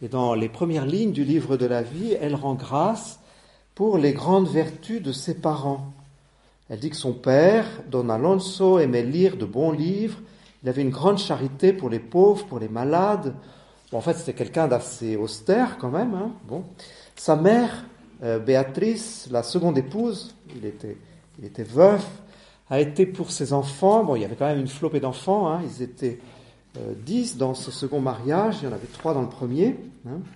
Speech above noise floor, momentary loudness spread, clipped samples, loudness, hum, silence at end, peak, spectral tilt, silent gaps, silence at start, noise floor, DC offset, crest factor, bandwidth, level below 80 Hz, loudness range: 36 dB; 16 LU; under 0.1%; -23 LUFS; none; 0 s; -2 dBFS; -6.5 dB/octave; none; 0 s; -58 dBFS; under 0.1%; 20 dB; 11.5 kHz; -60 dBFS; 5 LU